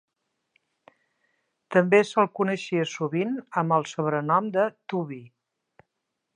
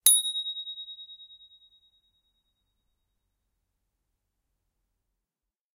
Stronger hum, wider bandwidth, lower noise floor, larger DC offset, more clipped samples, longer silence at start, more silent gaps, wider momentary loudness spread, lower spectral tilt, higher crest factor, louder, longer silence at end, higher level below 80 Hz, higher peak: neither; second, 10 kHz vs 15.5 kHz; second, -81 dBFS vs under -90 dBFS; neither; neither; first, 1.7 s vs 0.05 s; neither; second, 11 LU vs 25 LU; first, -6 dB/octave vs 5 dB/octave; second, 22 dB vs 32 dB; about the same, -25 LUFS vs -26 LUFS; second, 1.1 s vs 4.45 s; about the same, -80 dBFS vs -78 dBFS; about the same, -4 dBFS vs -2 dBFS